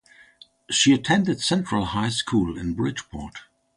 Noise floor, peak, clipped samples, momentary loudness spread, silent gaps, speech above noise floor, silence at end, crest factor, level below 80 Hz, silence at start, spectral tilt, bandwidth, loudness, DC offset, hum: -53 dBFS; -6 dBFS; under 0.1%; 16 LU; none; 30 dB; 0.35 s; 18 dB; -46 dBFS; 0.7 s; -4 dB/octave; 11.5 kHz; -22 LUFS; under 0.1%; none